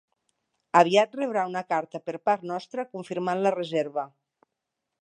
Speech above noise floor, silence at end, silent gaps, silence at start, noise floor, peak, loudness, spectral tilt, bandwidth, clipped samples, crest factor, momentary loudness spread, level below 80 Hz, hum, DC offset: 58 dB; 0.95 s; none; 0.75 s; -84 dBFS; -4 dBFS; -26 LUFS; -5 dB/octave; 10 kHz; under 0.1%; 24 dB; 13 LU; -82 dBFS; none; under 0.1%